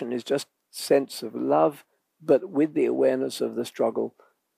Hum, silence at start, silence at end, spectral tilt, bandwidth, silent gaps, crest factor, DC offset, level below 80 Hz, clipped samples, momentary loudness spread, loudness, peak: none; 0 s; 0.5 s; -5 dB/octave; 15.5 kHz; none; 18 dB; under 0.1%; -86 dBFS; under 0.1%; 11 LU; -25 LUFS; -8 dBFS